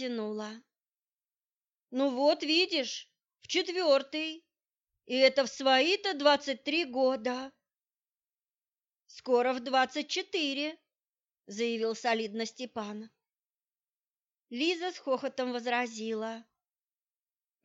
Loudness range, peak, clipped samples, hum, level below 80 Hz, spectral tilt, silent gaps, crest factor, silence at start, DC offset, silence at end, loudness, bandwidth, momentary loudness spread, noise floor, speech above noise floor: 8 LU; -10 dBFS; under 0.1%; none; -84 dBFS; -2.5 dB/octave; 1.52-1.56 s, 13.46-13.50 s; 22 dB; 0 s; under 0.1%; 1.2 s; -30 LUFS; 8 kHz; 14 LU; under -90 dBFS; over 60 dB